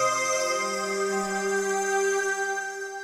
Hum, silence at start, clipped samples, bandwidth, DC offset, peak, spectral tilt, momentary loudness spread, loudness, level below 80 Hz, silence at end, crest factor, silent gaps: none; 0 s; under 0.1%; 15.5 kHz; under 0.1%; -14 dBFS; -2 dB/octave; 4 LU; -26 LUFS; -70 dBFS; 0 s; 14 dB; none